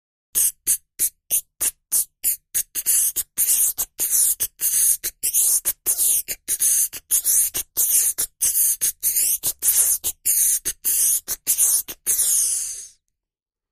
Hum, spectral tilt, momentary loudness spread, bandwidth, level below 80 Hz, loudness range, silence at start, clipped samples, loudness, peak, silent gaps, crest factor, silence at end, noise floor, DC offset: none; 2 dB/octave; 7 LU; 15.5 kHz; -54 dBFS; 2 LU; 0.35 s; under 0.1%; -18 LUFS; -4 dBFS; none; 18 dB; 0.85 s; -88 dBFS; under 0.1%